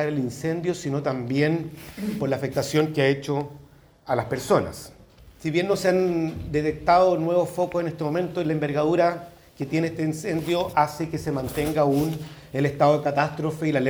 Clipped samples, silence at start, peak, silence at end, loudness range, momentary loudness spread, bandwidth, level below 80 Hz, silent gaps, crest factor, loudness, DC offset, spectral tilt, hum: under 0.1%; 0 s; -6 dBFS; 0 s; 3 LU; 9 LU; over 20 kHz; -52 dBFS; none; 18 dB; -24 LUFS; under 0.1%; -6.5 dB/octave; none